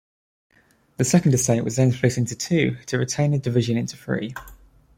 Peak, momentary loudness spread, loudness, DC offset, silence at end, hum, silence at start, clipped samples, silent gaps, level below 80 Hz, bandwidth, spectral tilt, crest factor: -4 dBFS; 9 LU; -22 LUFS; under 0.1%; 0.45 s; none; 1 s; under 0.1%; none; -52 dBFS; 16 kHz; -5.5 dB/octave; 18 dB